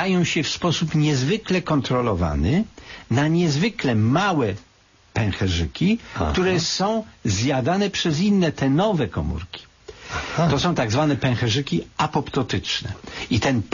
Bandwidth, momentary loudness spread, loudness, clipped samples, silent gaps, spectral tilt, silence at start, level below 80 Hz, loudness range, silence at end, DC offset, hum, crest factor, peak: 7.4 kHz; 8 LU; -22 LUFS; under 0.1%; none; -5.5 dB/octave; 0 s; -40 dBFS; 2 LU; 0 s; under 0.1%; none; 12 dB; -8 dBFS